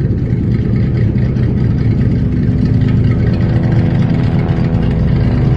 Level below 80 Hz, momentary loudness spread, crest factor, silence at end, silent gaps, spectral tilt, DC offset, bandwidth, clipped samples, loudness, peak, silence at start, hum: -22 dBFS; 2 LU; 10 dB; 0 s; none; -10 dB/octave; under 0.1%; 5.8 kHz; under 0.1%; -13 LUFS; -2 dBFS; 0 s; none